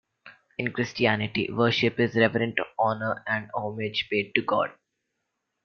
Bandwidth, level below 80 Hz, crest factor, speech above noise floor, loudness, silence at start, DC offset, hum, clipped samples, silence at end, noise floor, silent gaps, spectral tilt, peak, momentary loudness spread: 6.8 kHz; -64 dBFS; 24 dB; 54 dB; -26 LUFS; 0.25 s; under 0.1%; none; under 0.1%; 0.95 s; -80 dBFS; none; -6 dB/octave; -4 dBFS; 8 LU